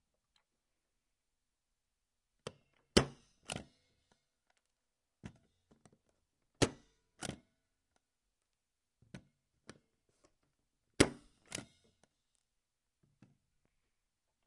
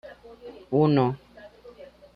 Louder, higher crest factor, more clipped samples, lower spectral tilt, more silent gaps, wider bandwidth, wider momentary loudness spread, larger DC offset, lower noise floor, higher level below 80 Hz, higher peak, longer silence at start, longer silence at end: second, -37 LUFS vs -23 LUFS; first, 38 dB vs 18 dB; neither; second, -4 dB/octave vs -10 dB/octave; neither; first, 11 kHz vs 5.4 kHz; about the same, 25 LU vs 24 LU; neither; first, -89 dBFS vs -48 dBFS; about the same, -60 dBFS vs -60 dBFS; about the same, -8 dBFS vs -10 dBFS; first, 2.45 s vs 0.05 s; first, 2.85 s vs 0.3 s